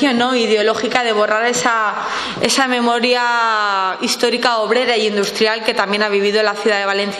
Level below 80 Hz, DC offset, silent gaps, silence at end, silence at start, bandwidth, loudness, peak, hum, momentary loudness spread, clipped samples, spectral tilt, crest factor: -62 dBFS; under 0.1%; none; 0 s; 0 s; 13.5 kHz; -15 LUFS; 0 dBFS; none; 3 LU; under 0.1%; -2.5 dB/octave; 16 dB